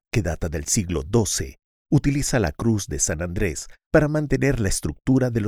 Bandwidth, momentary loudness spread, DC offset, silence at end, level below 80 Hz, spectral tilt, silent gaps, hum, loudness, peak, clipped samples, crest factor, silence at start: 16.5 kHz; 6 LU; under 0.1%; 0 s; -34 dBFS; -5 dB/octave; 1.64-1.85 s, 3.86-3.91 s; none; -23 LUFS; -4 dBFS; under 0.1%; 18 dB; 0.15 s